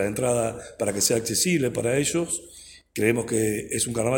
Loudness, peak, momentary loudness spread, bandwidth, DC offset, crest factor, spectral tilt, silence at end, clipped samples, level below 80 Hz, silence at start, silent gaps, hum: -24 LUFS; -6 dBFS; 9 LU; 17 kHz; under 0.1%; 18 dB; -4 dB/octave; 0 s; under 0.1%; -54 dBFS; 0 s; none; none